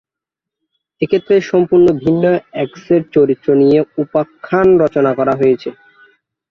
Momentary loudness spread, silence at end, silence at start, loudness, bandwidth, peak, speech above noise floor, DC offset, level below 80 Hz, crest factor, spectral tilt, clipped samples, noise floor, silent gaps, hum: 8 LU; 0.8 s; 1 s; -13 LUFS; 6.4 kHz; -2 dBFS; 72 dB; under 0.1%; -50 dBFS; 12 dB; -8.5 dB/octave; under 0.1%; -84 dBFS; none; none